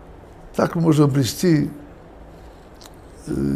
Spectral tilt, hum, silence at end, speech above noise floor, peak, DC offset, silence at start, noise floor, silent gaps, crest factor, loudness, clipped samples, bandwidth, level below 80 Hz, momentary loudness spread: -6.5 dB/octave; none; 0 s; 24 dB; -4 dBFS; under 0.1%; 0 s; -42 dBFS; none; 18 dB; -20 LUFS; under 0.1%; 15.5 kHz; -44 dBFS; 15 LU